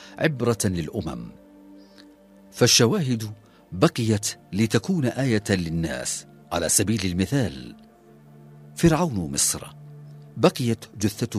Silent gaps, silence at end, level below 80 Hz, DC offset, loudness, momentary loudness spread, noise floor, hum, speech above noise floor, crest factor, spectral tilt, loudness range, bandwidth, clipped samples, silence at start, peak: none; 0 s; -48 dBFS; under 0.1%; -23 LUFS; 19 LU; -51 dBFS; none; 27 dB; 22 dB; -4.5 dB/octave; 3 LU; 15.5 kHz; under 0.1%; 0 s; -2 dBFS